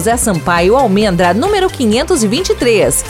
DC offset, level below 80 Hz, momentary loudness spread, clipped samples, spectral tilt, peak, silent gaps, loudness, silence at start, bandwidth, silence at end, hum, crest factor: 0.3%; -30 dBFS; 3 LU; under 0.1%; -4 dB/octave; 0 dBFS; none; -12 LUFS; 0 s; 19 kHz; 0 s; none; 12 dB